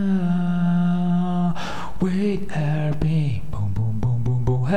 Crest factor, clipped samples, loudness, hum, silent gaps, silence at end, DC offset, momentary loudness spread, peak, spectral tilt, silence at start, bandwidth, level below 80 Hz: 14 dB; under 0.1%; -23 LUFS; none; none; 0 s; 5%; 6 LU; -6 dBFS; -8.5 dB/octave; 0 s; 8.8 kHz; -38 dBFS